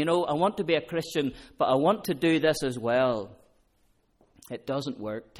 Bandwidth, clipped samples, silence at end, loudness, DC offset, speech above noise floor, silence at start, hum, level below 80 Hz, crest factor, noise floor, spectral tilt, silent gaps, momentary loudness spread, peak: 16 kHz; under 0.1%; 0.15 s; -27 LUFS; under 0.1%; 40 dB; 0 s; none; -60 dBFS; 16 dB; -67 dBFS; -5.5 dB/octave; none; 11 LU; -12 dBFS